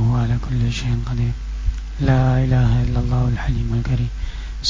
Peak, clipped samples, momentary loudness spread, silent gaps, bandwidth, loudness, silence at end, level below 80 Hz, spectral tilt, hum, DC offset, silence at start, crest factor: -6 dBFS; under 0.1%; 10 LU; none; 7.6 kHz; -20 LUFS; 0 s; -24 dBFS; -7 dB/octave; none; under 0.1%; 0 s; 12 dB